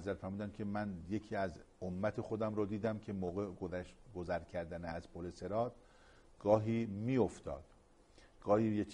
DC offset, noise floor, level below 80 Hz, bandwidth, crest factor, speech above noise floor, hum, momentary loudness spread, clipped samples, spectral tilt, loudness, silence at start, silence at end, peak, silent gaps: under 0.1%; -64 dBFS; -62 dBFS; 10.5 kHz; 22 dB; 26 dB; none; 13 LU; under 0.1%; -8 dB/octave; -39 LUFS; 0 s; 0 s; -16 dBFS; none